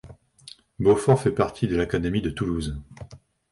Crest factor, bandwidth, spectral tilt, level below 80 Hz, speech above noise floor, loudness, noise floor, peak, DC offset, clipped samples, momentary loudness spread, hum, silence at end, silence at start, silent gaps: 20 dB; 11.5 kHz; -7 dB/octave; -42 dBFS; 26 dB; -24 LUFS; -49 dBFS; -6 dBFS; under 0.1%; under 0.1%; 24 LU; none; 0.35 s; 0.05 s; none